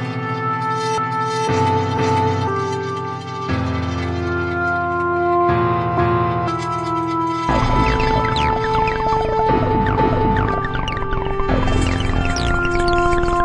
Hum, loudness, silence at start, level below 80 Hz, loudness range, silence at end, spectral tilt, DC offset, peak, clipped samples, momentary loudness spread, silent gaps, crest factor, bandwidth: none; -19 LUFS; 0 s; -28 dBFS; 3 LU; 0 s; -6.5 dB/octave; under 0.1%; -2 dBFS; under 0.1%; 6 LU; none; 16 dB; 11 kHz